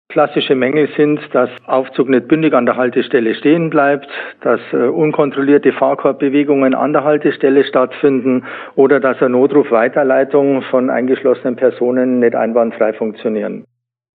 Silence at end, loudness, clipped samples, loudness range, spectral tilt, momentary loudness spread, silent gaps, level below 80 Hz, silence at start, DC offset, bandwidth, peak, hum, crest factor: 0.6 s; -14 LUFS; under 0.1%; 1 LU; -10 dB/octave; 5 LU; none; -66 dBFS; 0.1 s; under 0.1%; 4.6 kHz; 0 dBFS; none; 14 dB